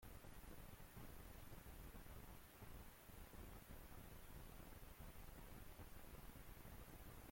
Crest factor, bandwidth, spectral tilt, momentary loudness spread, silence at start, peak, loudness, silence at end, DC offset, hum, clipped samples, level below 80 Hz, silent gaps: 12 dB; 16.5 kHz; -4.5 dB/octave; 1 LU; 0 s; -46 dBFS; -61 LUFS; 0 s; under 0.1%; none; under 0.1%; -62 dBFS; none